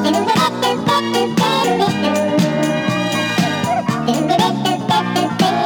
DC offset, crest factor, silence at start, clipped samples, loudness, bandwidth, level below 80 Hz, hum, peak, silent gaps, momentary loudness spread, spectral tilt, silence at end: under 0.1%; 14 dB; 0 s; under 0.1%; -16 LUFS; over 20 kHz; -54 dBFS; none; -2 dBFS; none; 3 LU; -5 dB/octave; 0 s